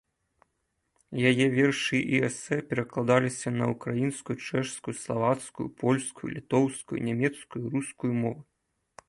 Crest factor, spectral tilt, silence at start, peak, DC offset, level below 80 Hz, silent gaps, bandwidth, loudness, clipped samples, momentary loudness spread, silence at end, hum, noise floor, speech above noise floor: 22 dB; -5.5 dB/octave; 1.1 s; -8 dBFS; under 0.1%; -64 dBFS; none; 11.5 kHz; -28 LUFS; under 0.1%; 10 LU; 0.65 s; none; -78 dBFS; 50 dB